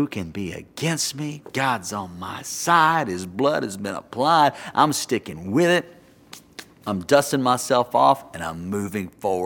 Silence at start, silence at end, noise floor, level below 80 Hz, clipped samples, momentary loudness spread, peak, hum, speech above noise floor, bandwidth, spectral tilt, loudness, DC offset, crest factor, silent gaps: 0 s; 0 s; -47 dBFS; -58 dBFS; under 0.1%; 14 LU; -2 dBFS; none; 25 dB; 18 kHz; -4 dB/octave; -22 LUFS; under 0.1%; 20 dB; none